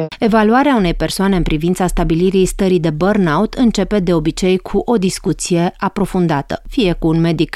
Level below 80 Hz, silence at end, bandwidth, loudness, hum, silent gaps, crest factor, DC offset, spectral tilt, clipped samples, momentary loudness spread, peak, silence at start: -28 dBFS; 0.05 s; 14.5 kHz; -15 LUFS; none; none; 12 dB; under 0.1%; -6 dB/octave; under 0.1%; 4 LU; -2 dBFS; 0 s